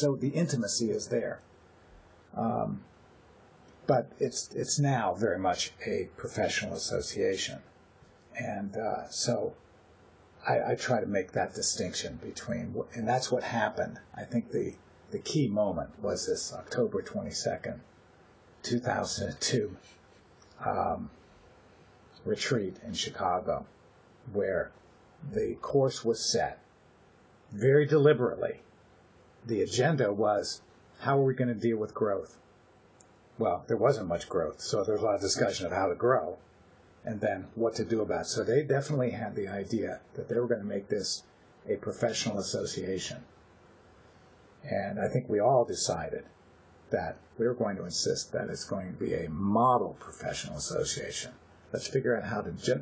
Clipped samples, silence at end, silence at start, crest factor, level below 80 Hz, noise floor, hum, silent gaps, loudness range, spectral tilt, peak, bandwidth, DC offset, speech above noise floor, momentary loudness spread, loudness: under 0.1%; 0 s; 0 s; 22 dB; -58 dBFS; -60 dBFS; none; none; 6 LU; -4.5 dB/octave; -10 dBFS; 8 kHz; under 0.1%; 30 dB; 11 LU; -31 LUFS